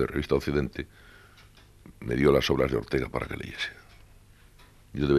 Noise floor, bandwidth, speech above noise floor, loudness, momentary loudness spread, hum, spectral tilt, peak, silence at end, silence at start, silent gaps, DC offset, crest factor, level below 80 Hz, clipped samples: -54 dBFS; 14 kHz; 28 dB; -28 LUFS; 17 LU; none; -6.5 dB/octave; -8 dBFS; 0 s; 0 s; none; under 0.1%; 22 dB; -44 dBFS; under 0.1%